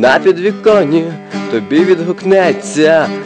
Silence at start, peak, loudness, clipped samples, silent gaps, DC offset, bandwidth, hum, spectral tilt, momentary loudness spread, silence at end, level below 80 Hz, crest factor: 0 s; 0 dBFS; -11 LUFS; under 0.1%; none; under 0.1%; 9.8 kHz; none; -5.5 dB/octave; 8 LU; 0 s; -56 dBFS; 10 dB